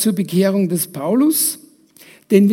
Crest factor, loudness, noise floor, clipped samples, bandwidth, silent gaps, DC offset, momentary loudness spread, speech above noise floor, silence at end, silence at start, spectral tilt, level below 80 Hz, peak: 16 dB; -17 LUFS; -46 dBFS; under 0.1%; 16.5 kHz; none; under 0.1%; 5 LU; 30 dB; 0 s; 0 s; -5 dB/octave; -72 dBFS; 0 dBFS